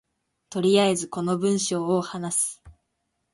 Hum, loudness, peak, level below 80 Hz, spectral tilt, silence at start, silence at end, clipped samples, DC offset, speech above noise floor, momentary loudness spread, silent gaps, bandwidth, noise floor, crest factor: none; -24 LUFS; -8 dBFS; -62 dBFS; -4 dB/octave; 0.5 s; 0.65 s; under 0.1%; under 0.1%; 53 dB; 7 LU; none; 12 kHz; -77 dBFS; 16 dB